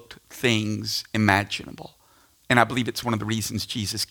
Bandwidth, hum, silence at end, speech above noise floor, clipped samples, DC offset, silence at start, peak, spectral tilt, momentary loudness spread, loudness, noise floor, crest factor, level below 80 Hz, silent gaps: 18 kHz; none; 0.05 s; 34 dB; under 0.1%; under 0.1%; 0.1 s; 0 dBFS; -4 dB/octave; 11 LU; -24 LUFS; -59 dBFS; 24 dB; -56 dBFS; none